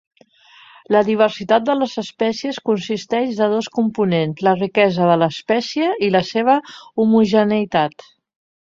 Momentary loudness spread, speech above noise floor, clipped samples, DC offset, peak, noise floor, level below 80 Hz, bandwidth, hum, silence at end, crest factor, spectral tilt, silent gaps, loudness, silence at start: 6 LU; 32 dB; under 0.1%; under 0.1%; -2 dBFS; -50 dBFS; -60 dBFS; 7.6 kHz; none; 0.85 s; 16 dB; -6 dB/octave; none; -18 LUFS; 0.9 s